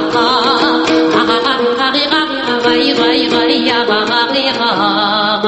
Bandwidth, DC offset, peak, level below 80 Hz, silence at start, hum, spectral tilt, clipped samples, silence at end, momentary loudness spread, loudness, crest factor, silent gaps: 8.6 kHz; under 0.1%; 0 dBFS; -50 dBFS; 0 s; none; -4 dB/octave; under 0.1%; 0 s; 2 LU; -12 LUFS; 12 dB; none